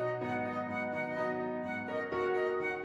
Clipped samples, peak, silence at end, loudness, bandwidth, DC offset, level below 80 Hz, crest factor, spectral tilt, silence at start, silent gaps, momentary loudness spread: under 0.1%; -22 dBFS; 0 s; -35 LUFS; 10.5 kHz; under 0.1%; -70 dBFS; 14 dB; -7 dB/octave; 0 s; none; 4 LU